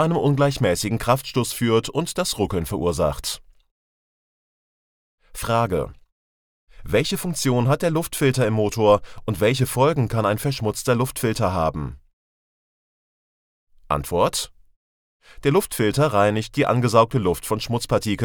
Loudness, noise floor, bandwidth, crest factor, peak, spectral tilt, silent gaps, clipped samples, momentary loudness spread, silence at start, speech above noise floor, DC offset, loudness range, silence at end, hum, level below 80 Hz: -21 LUFS; under -90 dBFS; over 20 kHz; 20 dB; -2 dBFS; -5.5 dB/octave; 3.71-5.18 s, 6.12-6.67 s, 12.13-13.67 s, 14.76-15.20 s; under 0.1%; 8 LU; 0 s; over 69 dB; under 0.1%; 8 LU; 0 s; none; -44 dBFS